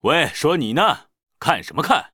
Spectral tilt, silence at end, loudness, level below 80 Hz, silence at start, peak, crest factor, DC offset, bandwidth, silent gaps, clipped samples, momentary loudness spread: -4.5 dB/octave; 0.05 s; -20 LUFS; -54 dBFS; 0.05 s; 0 dBFS; 20 dB; under 0.1%; 19.5 kHz; none; under 0.1%; 6 LU